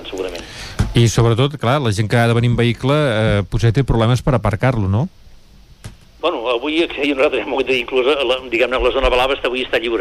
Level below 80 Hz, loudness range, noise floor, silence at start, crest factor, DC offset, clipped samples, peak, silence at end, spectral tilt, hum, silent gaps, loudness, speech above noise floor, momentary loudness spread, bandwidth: -32 dBFS; 4 LU; -43 dBFS; 0 s; 12 dB; under 0.1%; under 0.1%; -4 dBFS; 0 s; -6 dB/octave; none; none; -17 LUFS; 28 dB; 6 LU; 13.5 kHz